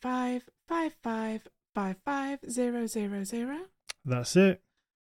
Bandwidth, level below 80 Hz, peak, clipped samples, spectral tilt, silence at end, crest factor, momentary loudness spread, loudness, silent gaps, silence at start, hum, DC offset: 16 kHz; -68 dBFS; -12 dBFS; under 0.1%; -5.5 dB/octave; 0.5 s; 20 dB; 15 LU; -31 LUFS; none; 0 s; none; under 0.1%